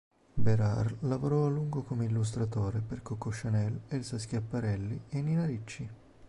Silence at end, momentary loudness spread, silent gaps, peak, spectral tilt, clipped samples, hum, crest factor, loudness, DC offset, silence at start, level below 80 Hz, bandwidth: 0.05 s; 9 LU; none; -16 dBFS; -7.5 dB/octave; under 0.1%; none; 16 dB; -33 LUFS; under 0.1%; 0.1 s; -52 dBFS; 11.5 kHz